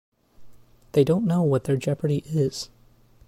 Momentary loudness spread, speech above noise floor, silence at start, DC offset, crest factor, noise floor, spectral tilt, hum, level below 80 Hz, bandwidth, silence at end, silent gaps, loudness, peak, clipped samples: 6 LU; 32 dB; 0.4 s; under 0.1%; 18 dB; -55 dBFS; -7.5 dB/octave; none; -56 dBFS; 15.5 kHz; 0.6 s; none; -24 LUFS; -8 dBFS; under 0.1%